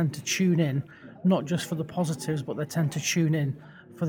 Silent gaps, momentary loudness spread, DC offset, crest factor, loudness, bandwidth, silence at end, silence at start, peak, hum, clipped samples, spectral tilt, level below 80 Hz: none; 8 LU; under 0.1%; 16 dB; -27 LUFS; 18 kHz; 0 s; 0 s; -12 dBFS; none; under 0.1%; -5.5 dB/octave; -66 dBFS